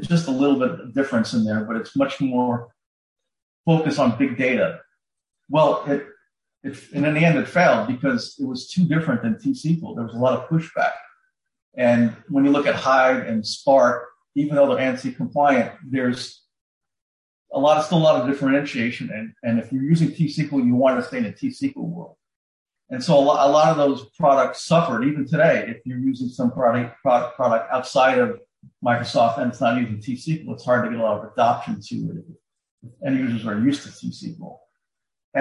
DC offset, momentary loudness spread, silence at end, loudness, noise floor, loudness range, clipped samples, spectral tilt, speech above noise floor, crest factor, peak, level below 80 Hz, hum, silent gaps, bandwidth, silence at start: under 0.1%; 12 LU; 0 s; -21 LUFS; -83 dBFS; 4 LU; under 0.1%; -6.5 dB/octave; 62 dB; 16 dB; -4 dBFS; -62 dBFS; none; 2.86-3.16 s, 3.42-3.64 s, 11.62-11.72 s, 16.61-16.81 s, 17.01-17.45 s, 22.36-22.66 s, 32.71-32.78 s, 35.24-35.32 s; 11.5 kHz; 0 s